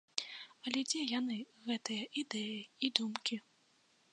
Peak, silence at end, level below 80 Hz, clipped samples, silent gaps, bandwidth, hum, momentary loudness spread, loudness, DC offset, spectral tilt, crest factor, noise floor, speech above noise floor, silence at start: -10 dBFS; 0.75 s; under -90 dBFS; under 0.1%; none; 11 kHz; none; 8 LU; -38 LUFS; under 0.1%; -2 dB/octave; 30 dB; -72 dBFS; 33 dB; 0.15 s